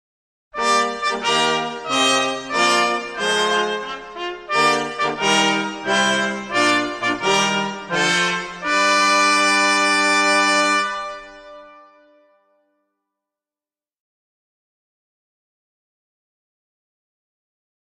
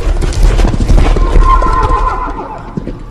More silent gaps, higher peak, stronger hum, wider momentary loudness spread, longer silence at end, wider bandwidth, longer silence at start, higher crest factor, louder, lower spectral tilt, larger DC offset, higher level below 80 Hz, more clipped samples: neither; second, -4 dBFS vs 0 dBFS; neither; second, 9 LU vs 12 LU; first, 6.25 s vs 0 s; first, 14 kHz vs 10.5 kHz; first, 0.55 s vs 0 s; first, 18 dB vs 8 dB; second, -17 LUFS vs -13 LUFS; second, -2 dB/octave vs -6.5 dB/octave; neither; second, -58 dBFS vs -10 dBFS; second, under 0.1% vs 2%